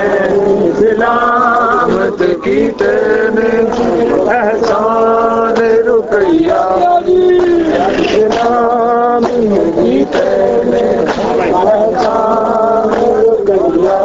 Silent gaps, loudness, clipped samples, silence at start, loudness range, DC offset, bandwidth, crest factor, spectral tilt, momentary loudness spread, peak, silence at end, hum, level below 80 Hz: none; -11 LUFS; under 0.1%; 0 s; 1 LU; under 0.1%; 7.8 kHz; 10 dB; -6.5 dB/octave; 2 LU; 0 dBFS; 0 s; none; -40 dBFS